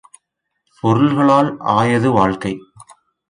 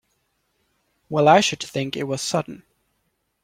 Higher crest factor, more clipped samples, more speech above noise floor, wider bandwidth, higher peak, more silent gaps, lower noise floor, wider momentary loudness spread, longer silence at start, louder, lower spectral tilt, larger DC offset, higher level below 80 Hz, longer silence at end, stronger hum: second, 16 dB vs 22 dB; neither; first, 58 dB vs 52 dB; second, 10.5 kHz vs 16 kHz; about the same, 0 dBFS vs -2 dBFS; neither; about the same, -73 dBFS vs -72 dBFS; about the same, 11 LU vs 12 LU; second, 0.85 s vs 1.1 s; first, -15 LUFS vs -20 LUFS; first, -7 dB/octave vs -4 dB/octave; neither; first, -50 dBFS vs -64 dBFS; second, 0.7 s vs 0.85 s; neither